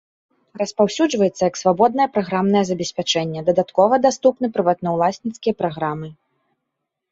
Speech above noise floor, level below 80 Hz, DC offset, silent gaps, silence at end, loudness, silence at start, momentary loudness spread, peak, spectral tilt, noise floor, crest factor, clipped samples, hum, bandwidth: 60 dB; -60 dBFS; under 0.1%; none; 1 s; -19 LUFS; 0.55 s; 8 LU; -2 dBFS; -5 dB/octave; -79 dBFS; 16 dB; under 0.1%; none; 8 kHz